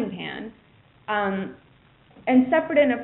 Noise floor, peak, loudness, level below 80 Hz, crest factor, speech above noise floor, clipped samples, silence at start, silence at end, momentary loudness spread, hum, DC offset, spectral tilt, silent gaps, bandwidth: -56 dBFS; -8 dBFS; -23 LUFS; -62 dBFS; 16 dB; 35 dB; under 0.1%; 0 s; 0 s; 18 LU; none; under 0.1%; -4 dB/octave; none; 4.1 kHz